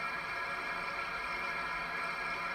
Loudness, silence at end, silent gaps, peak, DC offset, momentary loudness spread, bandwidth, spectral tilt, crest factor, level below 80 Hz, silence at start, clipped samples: -36 LUFS; 0 s; none; -24 dBFS; under 0.1%; 1 LU; 16 kHz; -3 dB/octave; 14 dB; -62 dBFS; 0 s; under 0.1%